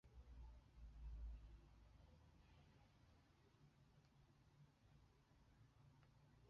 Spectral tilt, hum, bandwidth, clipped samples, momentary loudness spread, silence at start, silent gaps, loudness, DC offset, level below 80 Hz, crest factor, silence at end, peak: -6.5 dB/octave; none; 6.8 kHz; under 0.1%; 9 LU; 0.05 s; none; -63 LUFS; under 0.1%; -64 dBFS; 18 dB; 0 s; -46 dBFS